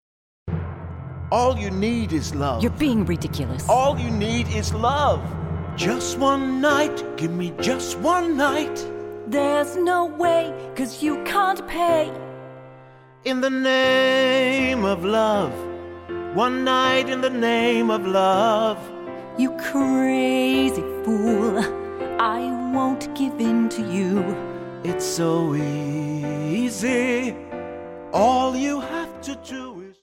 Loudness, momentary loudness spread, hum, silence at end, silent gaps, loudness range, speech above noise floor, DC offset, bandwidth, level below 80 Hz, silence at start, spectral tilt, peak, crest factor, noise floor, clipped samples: -22 LUFS; 13 LU; none; 0.1 s; none; 3 LU; 26 dB; under 0.1%; 16.5 kHz; -46 dBFS; 0.45 s; -5 dB/octave; -6 dBFS; 16 dB; -47 dBFS; under 0.1%